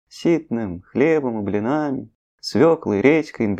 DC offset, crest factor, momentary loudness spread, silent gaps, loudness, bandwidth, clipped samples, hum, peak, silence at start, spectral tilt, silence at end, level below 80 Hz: under 0.1%; 18 dB; 10 LU; 2.15-2.38 s; -20 LUFS; 9.8 kHz; under 0.1%; none; 0 dBFS; 0.15 s; -7 dB/octave; 0 s; -56 dBFS